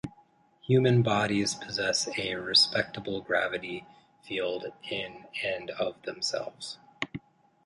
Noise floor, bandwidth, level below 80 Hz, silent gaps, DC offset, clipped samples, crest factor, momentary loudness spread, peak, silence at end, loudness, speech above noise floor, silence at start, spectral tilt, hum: -62 dBFS; 11.5 kHz; -64 dBFS; none; under 0.1%; under 0.1%; 20 dB; 16 LU; -10 dBFS; 0.45 s; -29 LUFS; 33 dB; 0.05 s; -4 dB/octave; none